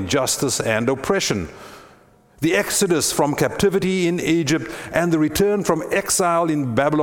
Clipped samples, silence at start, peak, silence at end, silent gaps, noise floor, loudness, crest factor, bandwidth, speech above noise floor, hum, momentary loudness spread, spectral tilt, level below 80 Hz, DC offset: under 0.1%; 0 s; -2 dBFS; 0 s; none; -51 dBFS; -19 LUFS; 18 dB; 18 kHz; 32 dB; none; 5 LU; -4 dB/octave; -46 dBFS; under 0.1%